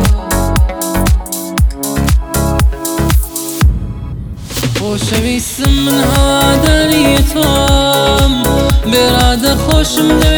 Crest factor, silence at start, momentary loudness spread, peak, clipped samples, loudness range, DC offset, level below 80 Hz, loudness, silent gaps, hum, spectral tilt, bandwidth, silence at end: 10 dB; 0 s; 6 LU; 0 dBFS; under 0.1%; 5 LU; under 0.1%; -16 dBFS; -12 LUFS; none; none; -4.5 dB/octave; over 20 kHz; 0 s